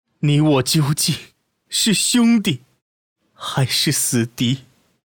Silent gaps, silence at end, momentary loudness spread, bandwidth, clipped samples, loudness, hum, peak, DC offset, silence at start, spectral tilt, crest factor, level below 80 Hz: 2.82-3.16 s; 0.45 s; 11 LU; over 20 kHz; under 0.1%; -18 LUFS; none; -6 dBFS; under 0.1%; 0.2 s; -4 dB/octave; 14 dB; -58 dBFS